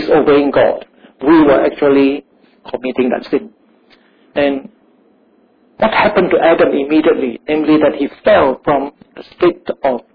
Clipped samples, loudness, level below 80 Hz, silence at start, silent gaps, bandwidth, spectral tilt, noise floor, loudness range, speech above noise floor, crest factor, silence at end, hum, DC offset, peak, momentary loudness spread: under 0.1%; -13 LUFS; -46 dBFS; 0 s; none; 5.2 kHz; -9 dB/octave; -52 dBFS; 8 LU; 40 dB; 12 dB; 0.15 s; none; under 0.1%; -2 dBFS; 10 LU